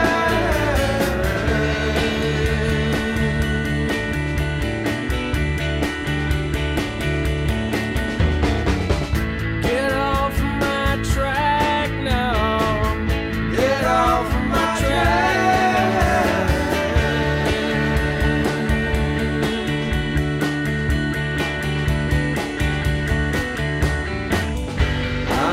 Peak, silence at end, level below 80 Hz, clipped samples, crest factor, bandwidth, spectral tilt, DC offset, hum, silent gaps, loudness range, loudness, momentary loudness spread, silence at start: -6 dBFS; 0 s; -26 dBFS; under 0.1%; 14 dB; 16 kHz; -5.5 dB/octave; under 0.1%; none; none; 4 LU; -20 LUFS; 5 LU; 0 s